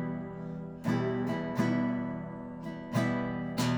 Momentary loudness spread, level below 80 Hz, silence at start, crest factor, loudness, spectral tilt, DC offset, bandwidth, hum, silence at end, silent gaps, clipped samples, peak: 11 LU; -60 dBFS; 0 s; 16 dB; -33 LUFS; -6.5 dB/octave; under 0.1%; over 20 kHz; none; 0 s; none; under 0.1%; -16 dBFS